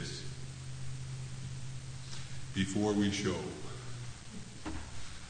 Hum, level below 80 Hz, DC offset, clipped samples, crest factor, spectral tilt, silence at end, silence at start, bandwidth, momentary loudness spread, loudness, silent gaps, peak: none; -54 dBFS; under 0.1%; under 0.1%; 18 dB; -5 dB/octave; 0 s; 0 s; 9.6 kHz; 14 LU; -39 LUFS; none; -20 dBFS